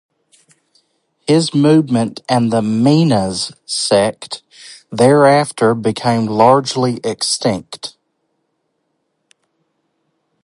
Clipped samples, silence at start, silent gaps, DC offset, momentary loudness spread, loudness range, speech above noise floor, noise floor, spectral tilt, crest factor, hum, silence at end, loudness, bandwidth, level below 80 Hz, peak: under 0.1%; 1.3 s; none; under 0.1%; 17 LU; 8 LU; 55 dB; -69 dBFS; -5.5 dB/octave; 16 dB; none; 2.55 s; -14 LUFS; 11.5 kHz; -54 dBFS; 0 dBFS